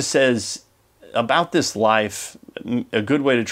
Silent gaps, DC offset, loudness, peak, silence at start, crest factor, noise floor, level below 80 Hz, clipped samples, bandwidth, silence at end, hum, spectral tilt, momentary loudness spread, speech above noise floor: none; under 0.1%; -20 LUFS; -2 dBFS; 0 s; 20 dB; -50 dBFS; -62 dBFS; under 0.1%; 16 kHz; 0 s; none; -4 dB/octave; 14 LU; 30 dB